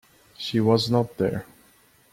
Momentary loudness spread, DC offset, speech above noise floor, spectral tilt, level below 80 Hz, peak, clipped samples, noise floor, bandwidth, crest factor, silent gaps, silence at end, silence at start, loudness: 12 LU; under 0.1%; 35 dB; -6.5 dB/octave; -56 dBFS; -6 dBFS; under 0.1%; -58 dBFS; 16 kHz; 20 dB; none; 0.7 s; 0.4 s; -24 LUFS